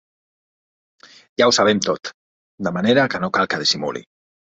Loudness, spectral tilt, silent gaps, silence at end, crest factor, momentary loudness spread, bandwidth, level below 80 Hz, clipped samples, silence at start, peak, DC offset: -18 LUFS; -3.5 dB/octave; 2.14-2.58 s; 0.6 s; 20 dB; 14 LU; 8.4 kHz; -58 dBFS; under 0.1%; 1.4 s; -2 dBFS; under 0.1%